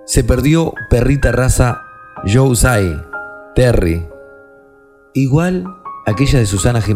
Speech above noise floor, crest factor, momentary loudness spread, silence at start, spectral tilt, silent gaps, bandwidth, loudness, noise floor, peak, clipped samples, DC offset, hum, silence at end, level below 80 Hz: 33 dB; 14 dB; 13 LU; 0.1 s; -6 dB/octave; none; 15.5 kHz; -14 LUFS; -46 dBFS; 0 dBFS; under 0.1%; under 0.1%; none; 0 s; -24 dBFS